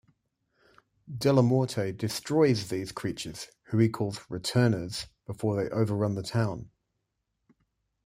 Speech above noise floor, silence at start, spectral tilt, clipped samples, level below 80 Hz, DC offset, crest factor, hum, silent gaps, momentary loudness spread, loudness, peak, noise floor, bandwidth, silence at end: 53 dB; 1.1 s; -6.5 dB/octave; under 0.1%; -62 dBFS; under 0.1%; 20 dB; none; none; 13 LU; -28 LUFS; -8 dBFS; -81 dBFS; 15.5 kHz; 1.4 s